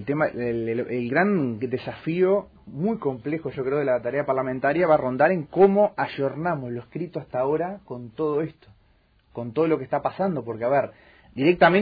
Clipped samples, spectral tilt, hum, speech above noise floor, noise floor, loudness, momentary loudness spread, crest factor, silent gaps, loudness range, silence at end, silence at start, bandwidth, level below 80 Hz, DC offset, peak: under 0.1%; -10 dB/octave; none; 38 dB; -61 dBFS; -24 LUFS; 13 LU; 20 dB; none; 6 LU; 0 s; 0 s; 5 kHz; -58 dBFS; under 0.1%; -4 dBFS